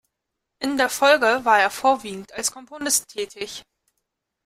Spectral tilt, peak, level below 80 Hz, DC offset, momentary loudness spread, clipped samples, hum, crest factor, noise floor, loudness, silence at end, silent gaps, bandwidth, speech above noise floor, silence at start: -1 dB/octave; -4 dBFS; -62 dBFS; under 0.1%; 16 LU; under 0.1%; none; 20 dB; -81 dBFS; -20 LUFS; 0.85 s; none; 16 kHz; 59 dB; 0.6 s